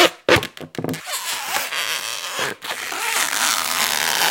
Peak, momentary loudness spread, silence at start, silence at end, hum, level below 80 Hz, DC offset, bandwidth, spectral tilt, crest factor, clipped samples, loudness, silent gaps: 0 dBFS; 9 LU; 0 s; 0 s; none; -54 dBFS; under 0.1%; 17.5 kHz; -1.5 dB/octave; 22 dB; under 0.1%; -20 LUFS; none